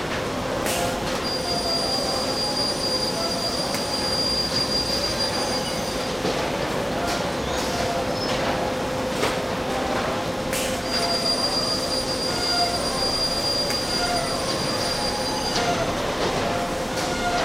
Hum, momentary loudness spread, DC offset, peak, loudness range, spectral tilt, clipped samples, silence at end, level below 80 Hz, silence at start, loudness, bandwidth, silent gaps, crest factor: none; 4 LU; under 0.1%; -8 dBFS; 3 LU; -3 dB/octave; under 0.1%; 0 s; -42 dBFS; 0 s; -23 LUFS; 16 kHz; none; 16 dB